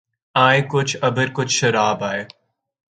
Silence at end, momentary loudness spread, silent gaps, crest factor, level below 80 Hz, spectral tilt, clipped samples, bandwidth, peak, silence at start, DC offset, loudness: 0.7 s; 10 LU; none; 20 dB; -62 dBFS; -4 dB/octave; under 0.1%; 9.4 kHz; 0 dBFS; 0.35 s; under 0.1%; -18 LUFS